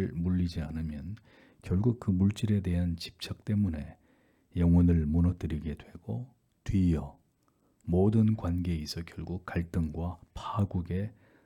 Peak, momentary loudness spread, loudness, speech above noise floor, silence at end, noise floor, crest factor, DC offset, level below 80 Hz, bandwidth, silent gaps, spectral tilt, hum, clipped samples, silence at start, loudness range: -14 dBFS; 16 LU; -31 LUFS; 41 dB; 0.3 s; -70 dBFS; 16 dB; under 0.1%; -48 dBFS; 12.5 kHz; none; -8 dB/octave; none; under 0.1%; 0 s; 2 LU